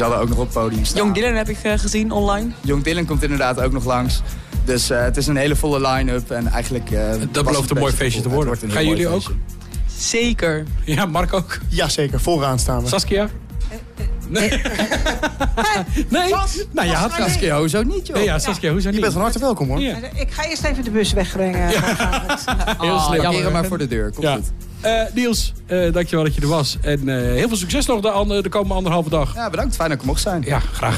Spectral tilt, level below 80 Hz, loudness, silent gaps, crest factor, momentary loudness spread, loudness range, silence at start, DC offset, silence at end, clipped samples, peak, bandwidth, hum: -4.5 dB/octave; -26 dBFS; -19 LUFS; none; 10 dB; 5 LU; 1 LU; 0 s; under 0.1%; 0 s; under 0.1%; -8 dBFS; 15 kHz; none